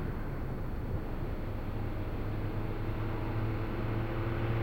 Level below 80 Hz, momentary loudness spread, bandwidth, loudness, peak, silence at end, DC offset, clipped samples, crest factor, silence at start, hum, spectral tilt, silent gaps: -38 dBFS; 4 LU; 16.5 kHz; -37 LUFS; -22 dBFS; 0 s; under 0.1%; under 0.1%; 12 dB; 0 s; none; -9 dB/octave; none